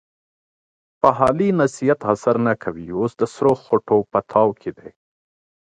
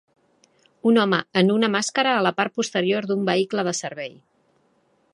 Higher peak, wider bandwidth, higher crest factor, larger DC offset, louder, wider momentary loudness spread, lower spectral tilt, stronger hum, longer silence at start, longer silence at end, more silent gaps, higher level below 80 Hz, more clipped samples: about the same, 0 dBFS vs -2 dBFS; about the same, 10.5 kHz vs 11.5 kHz; about the same, 20 dB vs 20 dB; neither; about the same, -19 LUFS vs -21 LUFS; about the same, 8 LU vs 8 LU; first, -7.5 dB/octave vs -4.5 dB/octave; neither; first, 1.05 s vs 0.85 s; second, 0.8 s vs 1.05 s; neither; first, -54 dBFS vs -72 dBFS; neither